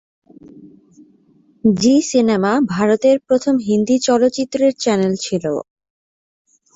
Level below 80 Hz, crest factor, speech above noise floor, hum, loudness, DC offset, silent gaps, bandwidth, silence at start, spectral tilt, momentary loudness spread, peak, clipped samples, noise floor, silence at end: -56 dBFS; 14 dB; 39 dB; none; -16 LUFS; under 0.1%; none; 8 kHz; 0.55 s; -5 dB/octave; 6 LU; -4 dBFS; under 0.1%; -54 dBFS; 1.15 s